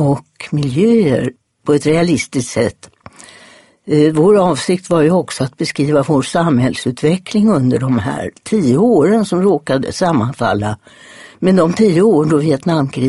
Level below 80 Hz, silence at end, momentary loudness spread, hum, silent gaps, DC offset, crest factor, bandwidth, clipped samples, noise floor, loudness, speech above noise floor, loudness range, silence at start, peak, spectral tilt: -48 dBFS; 0 s; 8 LU; none; none; under 0.1%; 14 dB; 11.5 kHz; under 0.1%; -44 dBFS; -14 LUFS; 31 dB; 2 LU; 0 s; 0 dBFS; -6.5 dB/octave